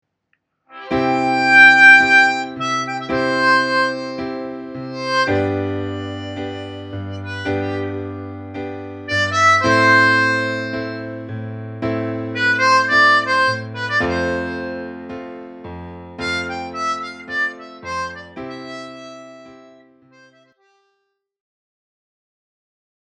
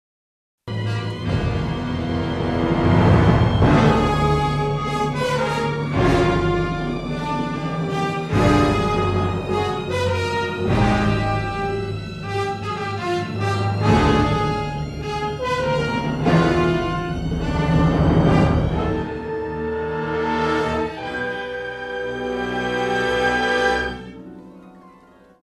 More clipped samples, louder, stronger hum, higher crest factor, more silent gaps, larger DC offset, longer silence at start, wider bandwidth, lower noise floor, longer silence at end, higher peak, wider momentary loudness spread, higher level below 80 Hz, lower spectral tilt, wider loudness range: neither; first, -16 LUFS vs -21 LUFS; neither; about the same, 18 dB vs 18 dB; neither; neither; about the same, 0.7 s vs 0.65 s; second, 10.5 kHz vs 12 kHz; first, -71 dBFS vs -49 dBFS; first, 3.45 s vs 0.55 s; about the same, 0 dBFS vs -2 dBFS; first, 20 LU vs 10 LU; second, -52 dBFS vs -32 dBFS; second, -4.5 dB/octave vs -7 dB/octave; first, 15 LU vs 5 LU